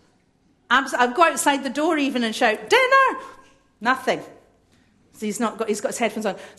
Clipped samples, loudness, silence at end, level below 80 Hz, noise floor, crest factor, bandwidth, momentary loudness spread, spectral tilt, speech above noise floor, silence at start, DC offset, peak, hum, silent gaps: under 0.1%; -21 LUFS; 0.1 s; -66 dBFS; -62 dBFS; 20 dB; 13 kHz; 10 LU; -2.5 dB/octave; 41 dB; 0.7 s; under 0.1%; -4 dBFS; none; none